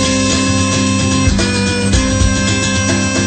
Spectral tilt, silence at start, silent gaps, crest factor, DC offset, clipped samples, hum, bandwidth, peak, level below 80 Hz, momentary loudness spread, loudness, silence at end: -4 dB/octave; 0 s; none; 12 dB; under 0.1%; under 0.1%; none; 9.2 kHz; 0 dBFS; -24 dBFS; 1 LU; -13 LUFS; 0 s